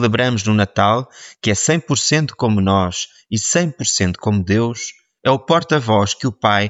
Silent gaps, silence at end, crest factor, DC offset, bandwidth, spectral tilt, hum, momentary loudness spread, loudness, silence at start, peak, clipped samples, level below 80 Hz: none; 0 s; 16 dB; under 0.1%; 8 kHz; -4.5 dB/octave; none; 7 LU; -17 LUFS; 0 s; -2 dBFS; under 0.1%; -50 dBFS